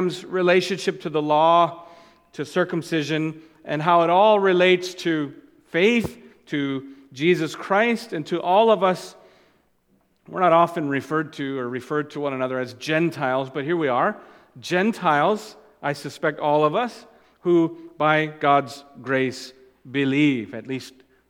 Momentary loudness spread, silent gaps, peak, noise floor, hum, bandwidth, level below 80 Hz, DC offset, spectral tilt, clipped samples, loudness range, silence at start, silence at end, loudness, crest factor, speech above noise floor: 15 LU; none; -4 dBFS; -64 dBFS; none; 15.5 kHz; -66 dBFS; under 0.1%; -5.5 dB/octave; under 0.1%; 4 LU; 0 s; 0.4 s; -22 LUFS; 18 dB; 43 dB